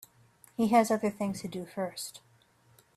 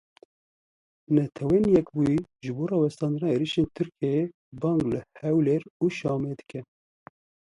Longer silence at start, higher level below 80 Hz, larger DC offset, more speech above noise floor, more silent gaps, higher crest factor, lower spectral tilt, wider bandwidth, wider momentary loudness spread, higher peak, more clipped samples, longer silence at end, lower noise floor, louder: second, 0.6 s vs 1.1 s; second, -72 dBFS vs -56 dBFS; neither; second, 35 dB vs over 65 dB; second, none vs 4.34-4.52 s, 5.70-5.80 s; about the same, 20 dB vs 18 dB; second, -5 dB/octave vs -8 dB/octave; first, 14.5 kHz vs 11 kHz; first, 16 LU vs 10 LU; second, -12 dBFS vs -8 dBFS; neither; second, 0.8 s vs 0.95 s; second, -64 dBFS vs under -90 dBFS; second, -30 LUFS vs -26 LUFS